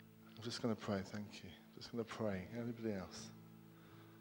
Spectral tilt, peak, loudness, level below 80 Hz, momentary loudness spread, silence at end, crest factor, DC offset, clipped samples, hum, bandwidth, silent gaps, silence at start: -5.5 dB/octave; -26 dBFS; -46 LUFS; -76 dBFS; 18 LU; 0 s; 20 dB; under 0.1%; under 0.1%; none; 17 kHz; none; 0 s